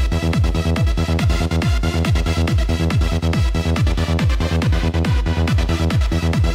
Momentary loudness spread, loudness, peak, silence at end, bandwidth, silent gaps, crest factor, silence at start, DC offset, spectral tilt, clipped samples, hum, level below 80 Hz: 1 LU; -19 LUFS; -10 dBFS; 0 s; 15 kHz; none; 8 dB; 0 s; under 0.1%; -6.5 dB/octave; under 0.1%; none; -20 dBFS